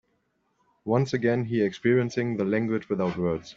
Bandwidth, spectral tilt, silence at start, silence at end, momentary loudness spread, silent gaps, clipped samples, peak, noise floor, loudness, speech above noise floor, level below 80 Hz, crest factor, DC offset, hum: 7.6 kHz; -7.5 dB/octave; 0.85 s; 0.05 s; 4 LU; none; under 0.1%; -10 dBFS; -72 dBFS; -26 LUFS; 47 dB; -62 dBFS; 18 dB; under 0.1%; none